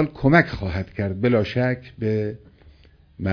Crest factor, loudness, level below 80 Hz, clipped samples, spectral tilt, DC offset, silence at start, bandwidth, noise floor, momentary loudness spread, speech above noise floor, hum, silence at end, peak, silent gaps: 20 dB; -22 LUFS; -44 dBFS; under 0.1%; -8.5 dB/octave; under 0.1%; 0 s; 5.4 kHz; -52 dBFS; 12 LU; 30 dB; none; 0 s; -2 dBFS; none